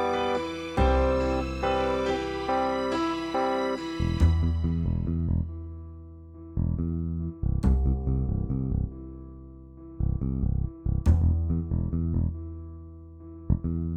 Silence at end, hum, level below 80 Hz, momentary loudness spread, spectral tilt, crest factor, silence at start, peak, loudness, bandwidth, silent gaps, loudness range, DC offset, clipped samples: 0 s; none; -32 dBFS; 20 LU; -8 dB/octave; 18 dB; 0 s; -10 dBFS; -28 LUFS; 8.8 kHz; none; 3 LU; under 0.1%; under 0.1%